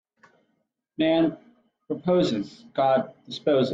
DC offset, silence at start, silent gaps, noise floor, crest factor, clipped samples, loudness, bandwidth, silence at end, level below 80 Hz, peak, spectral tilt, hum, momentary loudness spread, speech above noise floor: under 0.1%; 1 s; none; -75 dBFS; 16 dB; under 0.1%; -25 LUFS; 7.8 kHz; 0 s; -66 dBFS; -10 dBFS; -7 dB/octave; none; 12 LU; 51 dB